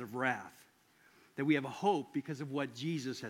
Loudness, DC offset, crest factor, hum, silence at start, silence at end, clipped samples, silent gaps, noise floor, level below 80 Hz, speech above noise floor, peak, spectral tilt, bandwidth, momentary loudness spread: -36 LUFS; under 0.1%; 20 dB; none; 0 s; 0 s; under 0.1%; none; -67 dBFS; -88 dBFS; 31 dB; -18 dBFS; -6 dB/octave; 16.5 kHz; 9 LU